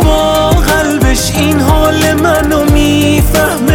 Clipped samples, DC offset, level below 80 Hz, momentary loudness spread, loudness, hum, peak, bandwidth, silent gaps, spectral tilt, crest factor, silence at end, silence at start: under 0.1%; under 0.1%; -16 dBFS; 2 LU; -9 LUFS; none; 0 dBFS; 19 kHz; none; -5 dB/octave; 8 dB; 0 s; 0 s